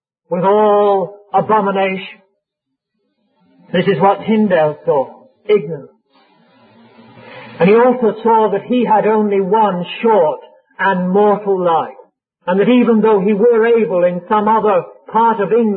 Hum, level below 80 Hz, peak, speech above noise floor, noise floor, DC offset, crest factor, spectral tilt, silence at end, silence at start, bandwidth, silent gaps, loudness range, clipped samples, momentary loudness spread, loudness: none; -64 dBFS; -2 dBFS; 64 dB; -77 dBFS; under 0.1%; 12 dB; -12 dB/octave; 0 s; 0.3 s; 4.6 kHz; none; 5 LU; under 0.1%; 8 LU; -14 LUFS